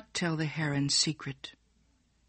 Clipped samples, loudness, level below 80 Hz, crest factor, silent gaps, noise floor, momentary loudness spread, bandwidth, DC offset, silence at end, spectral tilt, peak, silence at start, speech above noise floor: under 0.1%; -30 LUFS; -64 dBFS; 20 dB; none; -69 dBFS; 17 LU; 8.8 kHz; under 0.1%; 0.8 s; -3.5 dB/octave; -14 dBFS; 0.15 s; 38 dB